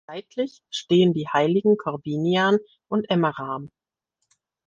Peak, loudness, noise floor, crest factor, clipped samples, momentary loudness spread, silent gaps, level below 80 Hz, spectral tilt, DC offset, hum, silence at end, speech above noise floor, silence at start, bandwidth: -8 dBFS; -23 LUFS; -79 dBFS; 16 dB; under 0.1%; 12 LU; none; -68 dBFS; -6.5 dB/octave; under 0.1%; none; 1 s; 57 dB; 0.1 s; 7.6 kHz